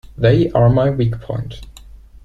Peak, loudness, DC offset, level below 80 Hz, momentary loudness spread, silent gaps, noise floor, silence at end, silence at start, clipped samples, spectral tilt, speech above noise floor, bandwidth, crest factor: -2 dBFS; -16 LUFS; under 0.1%; -36 dBFS; 16 LU; none; -39 dBFS; 0.3 s; 0.2 s; under 0.1%; -9 dB/octave; 24 dB; 7.2 kHz; 14 dB